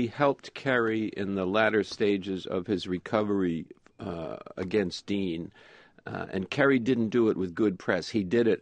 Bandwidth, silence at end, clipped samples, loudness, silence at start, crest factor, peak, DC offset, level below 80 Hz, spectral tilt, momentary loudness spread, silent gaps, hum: 9.8 kHz; 0 s; under 0.1%; -28 LUFS; 0 s; 20 dB; -8 dBFS; under 0.1%; -64 dBFS; -6.5 dB/octave; 13 LU; none; none